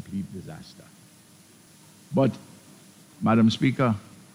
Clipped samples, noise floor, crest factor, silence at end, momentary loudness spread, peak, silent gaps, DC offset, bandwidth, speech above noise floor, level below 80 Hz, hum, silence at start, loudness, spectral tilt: under 0.1%; -53 dBFS; 18 dB; 0.35 s; 23 LU; -10 dBFS; none; under 0.1%; 14.5 kHz; 30 dB; -64 dBFS; none; 0.05 s; -24 LUFS; -7 dB/octave